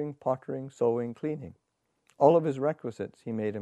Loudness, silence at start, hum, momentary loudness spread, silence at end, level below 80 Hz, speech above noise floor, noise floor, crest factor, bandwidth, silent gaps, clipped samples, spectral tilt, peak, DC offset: -29 LUFS; 0 s; none; 16 LU; 0 s; -72 dBFS; 42 dB; -71 dBFS; 22 dB; 9 kHz; none; under 0.1%; -8.5 dB/octave; -8 dBFS; under 0.1%